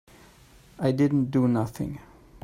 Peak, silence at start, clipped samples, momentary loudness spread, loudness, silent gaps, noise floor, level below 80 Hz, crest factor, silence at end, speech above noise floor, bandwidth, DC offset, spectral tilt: -10 dBFS; 0.8 s; under 0.1%; 12 LU; -25 LUFS; none; -54 dBFS; -54 dBFS; 16 dB; 0.45 s; 29 dB; 15 kHz; under 0.1%; -8.5 dB/octave